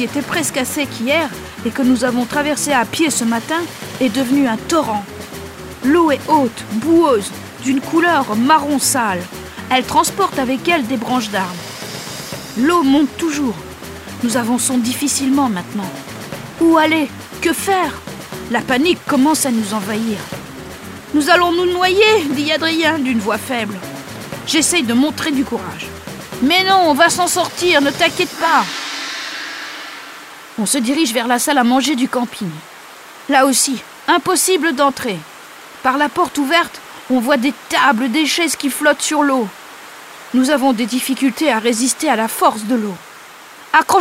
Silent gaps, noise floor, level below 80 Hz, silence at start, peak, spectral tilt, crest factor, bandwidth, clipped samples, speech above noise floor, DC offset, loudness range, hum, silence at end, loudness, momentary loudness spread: none; -38 dBFS; -50 dBFS; 0 s; 0 dBFS; -3 dB/octave; 16 dB; 16 kHz; under 0.1%; 22 dB; under 0.1%; 3 LU; none; 0 s; -16 LUFS; 17 LU